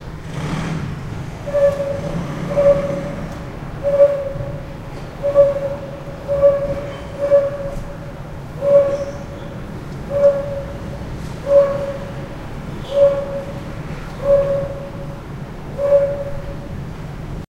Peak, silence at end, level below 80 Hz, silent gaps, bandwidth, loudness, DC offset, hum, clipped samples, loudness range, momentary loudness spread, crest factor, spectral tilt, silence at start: -2 dBFS; 0.05 s; -36 dBFS; none; 11 kHz; -19 LUFS; under 0.1%; none; under 0.1%; 2 LU; 16 LU; 18 dB; -7.5 dB/octave; 0 s